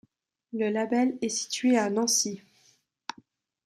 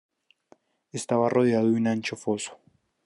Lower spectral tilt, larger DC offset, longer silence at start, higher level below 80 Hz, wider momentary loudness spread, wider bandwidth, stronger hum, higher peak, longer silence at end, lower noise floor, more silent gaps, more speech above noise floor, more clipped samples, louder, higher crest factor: second, -2.5 dB/octave vs -5.5 dB/octave; neither; second, 0.55 s vs 0.95 s; about the same, -78 dBFS vs -74 dBFS; first, 18 LU vs 15 LU; first, 14.5 kHz vs 11.5 kHz; neither; second, -14 dBFS vs -10 dBFS; first, 1.25 s vs 0.5 s; first, -66 dBFS vs -61 dBFS; neither; about the same, 40 dB vs 37 dB; neither; about the same, -26 LUFS vs -25 LUFS; about the same, 16 dB vs 18 dB